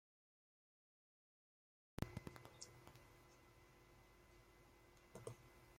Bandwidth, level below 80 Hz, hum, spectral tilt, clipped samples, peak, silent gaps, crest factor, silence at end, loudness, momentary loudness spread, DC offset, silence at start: 16.5 kHz; -72 dBFS; none; -5 dB/octave; under 0.1%; -28 dBFS; none; 34 dB; 0 s; -59 LUFS; 17 LU; under 0.1%; 1.95 s